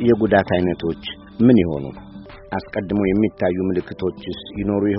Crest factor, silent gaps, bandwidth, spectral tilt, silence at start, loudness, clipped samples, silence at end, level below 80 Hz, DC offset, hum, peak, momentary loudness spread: 18 dB; none; 5.8 kHz; -6 dB/octave; 0 s; -20 LUFS; under 0.1%; 0 s; -44 dBFS; under 0.1%; none; 0 dBFS; 16 LU